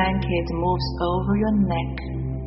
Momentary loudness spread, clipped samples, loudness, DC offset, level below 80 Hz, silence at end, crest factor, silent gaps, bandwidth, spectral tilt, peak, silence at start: 8 LU; under 0.1%; -23 LUFS; under 0.1%; -32 dBFS; 0 s; 14 dB; none; 6 kHz; -6 dB/octave; -8 dBFS; 0 s